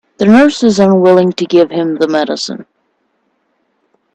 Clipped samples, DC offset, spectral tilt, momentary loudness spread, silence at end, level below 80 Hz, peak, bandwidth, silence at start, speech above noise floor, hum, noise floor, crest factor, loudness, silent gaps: under 0.1%; under 0.1%; -6 dB/octave; 11 LU; 1.55 s; -54 dBFS; 0 dBFS; 9.2 kHz; 0.2 s; 52 dB; none; -62 dBFS; 12 dB; -10 LUFS; none